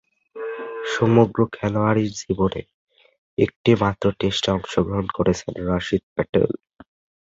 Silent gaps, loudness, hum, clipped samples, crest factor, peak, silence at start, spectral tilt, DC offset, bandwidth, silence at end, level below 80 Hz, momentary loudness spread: 2.74-2.87 s, 3.18-3.37 s, 3.56-3.64 s, 6.03-6.16 s; -22 LUFS; none; under 0.1%; 20 dB; -2 dBFS; 0.35 s; -6.5 dB/octave; under 0.1%; 7.8 kHz; 0.75 s; -44 dBFS; 12 LU